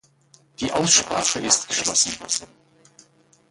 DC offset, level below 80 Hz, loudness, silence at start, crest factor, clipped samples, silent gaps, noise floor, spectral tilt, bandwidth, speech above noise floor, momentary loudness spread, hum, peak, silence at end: under 0.1%; -56 dBFS; -20 LUFS; 0.6 s; 22 dB; under 0.1%; none; -57 dBFS; -1 dB/octave; 11.5 kHz; 35 dB; 10 LU; none; -2 dBFS; 1.05 s